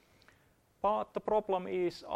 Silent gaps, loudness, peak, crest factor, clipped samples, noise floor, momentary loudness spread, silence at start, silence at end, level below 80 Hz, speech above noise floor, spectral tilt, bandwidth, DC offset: none; -34 LUFS; -18 dBFS; 16 dB; under 0.1%; -68 dBFS; 3 LU; 0.85 s; 0 s; -66 dBFS; 35 dB; -6.5 dB/octave; 13 kHz; under 0.1%